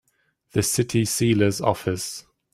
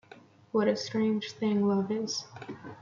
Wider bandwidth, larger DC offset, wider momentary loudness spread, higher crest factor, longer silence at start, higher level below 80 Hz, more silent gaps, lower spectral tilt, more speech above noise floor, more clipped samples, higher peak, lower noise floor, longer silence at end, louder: first, 16 kHz vs 7.4 kHz; neither; second, 10 LU vs 15 LU; about the same, 20 dB vs 16 dB; first, 0.55 s vs 0.15 s; first, -54 dBFS vs -74 dBFS; neither; about the same, -4.5 dB/octave vs -5.5 dB/octave; first, 44 dB vs 25 dB; neither; first, -4 dBFS vs -14 dBFS; first, -66 dBFS vs -55 dBFS; first, 0.35 s vs 0 s; first, -23 LUFS vs -30 LUFS